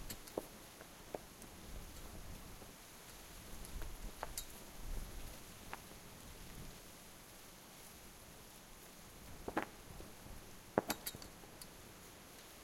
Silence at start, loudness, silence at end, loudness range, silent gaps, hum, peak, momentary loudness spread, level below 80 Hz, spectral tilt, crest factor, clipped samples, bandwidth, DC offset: 0 s; -50 LUFS; 0 s; 8 LU; none; none; -14 dBFS; 12 LU; -56 dBFS; -3.5 dB/octave; 36 dB; under 0.1%; 16.5 kHz; under 0.1%